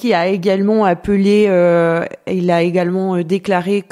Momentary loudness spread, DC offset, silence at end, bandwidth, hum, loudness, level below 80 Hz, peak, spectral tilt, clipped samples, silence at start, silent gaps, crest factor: 6 LU; under 0.1%; 0.1 s; 12 kHz; none; -15 LUFS; -48 dBFS; -4 dBFS; -7.5 dB/octave; under 0.1%; 0 s; none; 10 dB